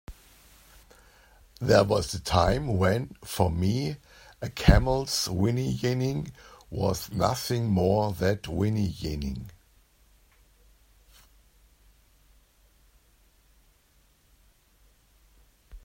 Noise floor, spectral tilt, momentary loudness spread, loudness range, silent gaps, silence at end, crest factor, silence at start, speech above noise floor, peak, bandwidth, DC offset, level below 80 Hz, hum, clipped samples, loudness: -63 dBFS; -5.5 dB/octave; 14 LU; 8 LU; none; 0.05 s; 26 dB; 0.1 s; 38 dB; -4 dBFS; 16.5 kHz; under 0.1%; -38 dBFS; none; under 0.1%; -27 LUFS